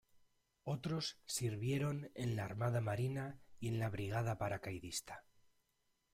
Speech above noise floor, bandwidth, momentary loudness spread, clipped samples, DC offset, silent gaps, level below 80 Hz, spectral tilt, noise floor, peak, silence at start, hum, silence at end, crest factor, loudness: 41 dB; 16 kHz; 7 LU; under 0.1%; under 0.1%; none; -68 dBFS; -5.5 dB/octave; -82 dBFS; -26 dBFS; 0.15 s; none; 0.95 s; 14 dB; -41 LUFS